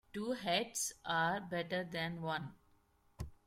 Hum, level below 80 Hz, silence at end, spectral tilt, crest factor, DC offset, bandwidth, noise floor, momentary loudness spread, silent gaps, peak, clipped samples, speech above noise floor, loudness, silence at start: none; -62 dBFS; 0.1 s; -3 dB/octave; 18 dB; under 0.1%; 16.5 kHz; -72 dBFS; 11 LU; none; -22 dBFS; under 0.1%; 33 dB; -38 LUFS; 0.15 s